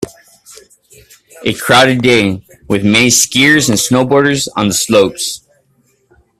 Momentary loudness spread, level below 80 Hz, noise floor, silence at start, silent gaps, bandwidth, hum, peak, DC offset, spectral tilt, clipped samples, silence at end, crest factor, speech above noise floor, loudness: 12 LU; -46 dBFS; -56 dBFS; 0 s; none; 16.5 kHz; none; 0 dBFS; under 0.1%; -3 dB/octave; under 0.1%; 1 s; 14 dB; 45 dB; -10 LUFS